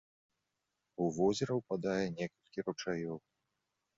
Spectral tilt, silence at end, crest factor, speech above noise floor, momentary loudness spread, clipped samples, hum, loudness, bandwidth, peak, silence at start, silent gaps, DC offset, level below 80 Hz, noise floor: -5.5 dB/octave; 0.8 s; 20 dB; 51 dB; 11 LU; under 0.1%; none; -37 LUFS; 7.6 kHz; -18 dBFS; 1 s; none; under 0.1%; -70 dBFS; -86 dBFS